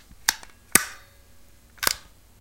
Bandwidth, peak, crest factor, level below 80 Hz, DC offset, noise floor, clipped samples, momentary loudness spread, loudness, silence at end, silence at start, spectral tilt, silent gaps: 17 kHz; 0 dBFS; 30 dB; -54 dBFS; 0.2%; -53 dBFS; under 0.1%; 14 LU; -24 LUFS; 0.4 s; 0.3 s; 0 dB/octave; none